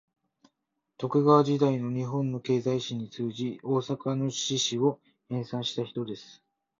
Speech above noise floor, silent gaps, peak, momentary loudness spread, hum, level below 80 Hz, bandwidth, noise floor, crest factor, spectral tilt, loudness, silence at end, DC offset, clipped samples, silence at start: 54 dB; none; -6 dBFS; 14 LU; none; -68 dBFS; 7.8 kHz; -82 dBFS; 22 dB; -5.5 dB/octave; -28 LUFS; 0.45 s; under 0.1%; under 0.1%; 1 s